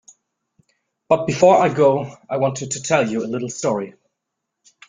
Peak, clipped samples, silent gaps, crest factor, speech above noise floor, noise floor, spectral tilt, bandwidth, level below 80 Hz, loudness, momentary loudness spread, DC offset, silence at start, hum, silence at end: -2 dBFS; under 0.1%; none; 18 dB; 61 dB; -79 dBFS; -5 dB/octave; 9.6 kHz; -60 dBFS; -19 LUFS; 12 LU; under 0.1%; 1.1 s; none; 1 s